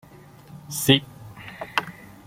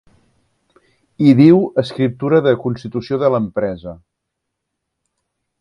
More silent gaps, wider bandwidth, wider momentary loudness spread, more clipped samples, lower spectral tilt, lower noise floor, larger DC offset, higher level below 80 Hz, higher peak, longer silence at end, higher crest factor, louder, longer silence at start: neither; first, 16.5 kHz vs 10 kHz; first, 23 LU vs 14 LU; neither; second, -4 dB/octave vs -9 dB/octave; second, -47 dBFS vs -77 dBFS; neither; second, -60 dBFS vs -52 dBFS; about the same, -2 dBFS vs 0 dBFS; second, 0.2 s vs 1.65 s; first, 26 dB vs 18 dB; second, -23 LUFS vs -15 LUFS; second, 0.5 s vs 1.2 s